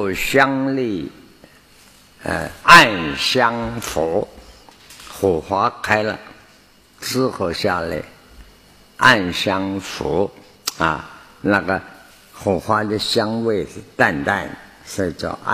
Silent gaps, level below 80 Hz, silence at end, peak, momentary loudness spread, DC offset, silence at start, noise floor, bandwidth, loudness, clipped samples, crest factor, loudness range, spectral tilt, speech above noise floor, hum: none; -46 dBFS; 0 s; 0 dBFS; 16 LU; under 0.1%; 0 s; -50 dBFS; 15 kHz; -18 LUFS; under 0.1%; 20 dB; 7 LU; -4 dB/octave; 32 dB; none